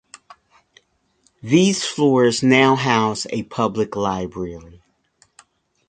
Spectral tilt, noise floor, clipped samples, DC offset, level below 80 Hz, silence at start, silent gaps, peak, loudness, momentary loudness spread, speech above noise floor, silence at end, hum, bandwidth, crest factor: -5 dB/octave; -63 dBFS; under 0.1%; under 0.1%; -54 dBFS; 1.45 s; none; 0 dBFS; -18 LUFS; 15 LU; 45 dB; 1.2 s; none; 9.4 kHz; 20 dB